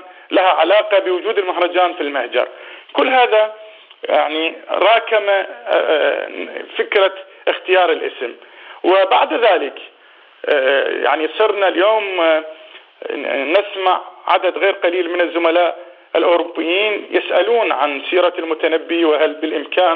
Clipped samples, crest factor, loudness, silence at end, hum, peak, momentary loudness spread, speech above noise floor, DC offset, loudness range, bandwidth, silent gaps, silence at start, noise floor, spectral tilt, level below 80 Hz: under 0.1%; 16 dB; -16 LUFS; 0 s; none; 0 dBFS; 10 LU; 31 dB; under 0.1%; 2 LU; 4.8 kHz; none; 0 s; -47 dBFS; -4.5 dB/octave; -86 dBFS